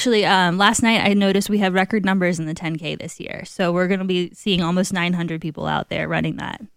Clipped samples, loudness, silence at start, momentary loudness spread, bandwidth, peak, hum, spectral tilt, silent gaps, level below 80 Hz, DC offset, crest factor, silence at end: under 0.1%; -20 LUFS; 0 s; 11 LU; 15.5 kHz; -2 dBFS; none; -4.5 dB/octave; none; -50 dBFS; under 0.1%; 18 dB; 0.1 s